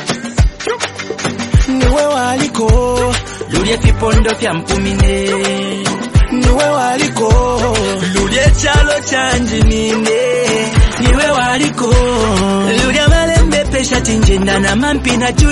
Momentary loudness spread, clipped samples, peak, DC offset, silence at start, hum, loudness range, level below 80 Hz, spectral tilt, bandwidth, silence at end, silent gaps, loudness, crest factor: 5 LU; under 0.1%; 0 dBFS; under 0.1%; 0 s; none; 2 LU; -16 dBFS; -4.5 dB/octave; 11.5 kHz; 0 s; none; -13 LUFS; 12 dB